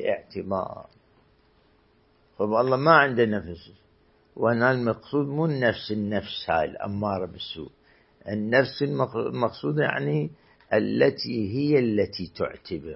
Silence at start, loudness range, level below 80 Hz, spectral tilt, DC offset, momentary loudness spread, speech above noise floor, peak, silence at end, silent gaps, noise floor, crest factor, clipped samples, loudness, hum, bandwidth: 0 s; 4 LU; -58 dBFS; -10.5 dB/octave; under 0.1%; 13 LU; 37 dB; -2 dBFS; 0 s; none; -62 dBFS; 24 dB; under 0.1%; -25 LUFS; none; 5.8 kHz